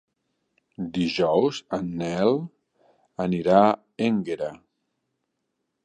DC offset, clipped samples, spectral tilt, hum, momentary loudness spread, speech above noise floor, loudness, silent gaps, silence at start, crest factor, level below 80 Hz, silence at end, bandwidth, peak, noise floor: under 0.1%; under 0.1%; -6.5 dB/octave; none; 14 LU; 56 dB; -24 LUFS; none; 0.8 s; 22 dB; -60 dBFS; 1.3 s; 10 kHz; -4 dBFS; -78 dBFS